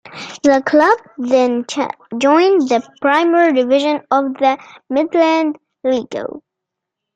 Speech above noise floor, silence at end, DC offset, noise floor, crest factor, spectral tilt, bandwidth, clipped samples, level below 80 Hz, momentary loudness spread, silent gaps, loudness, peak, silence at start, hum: 66 dB; 0.75 s; under 0.1%; -80 dBFS; 14 dB; -4 dB/octave; 9 kHz; under 0.1%; -62 dBFS; 11 LU; none; -15 LUFS; -2 dBFS; 0.05 s; none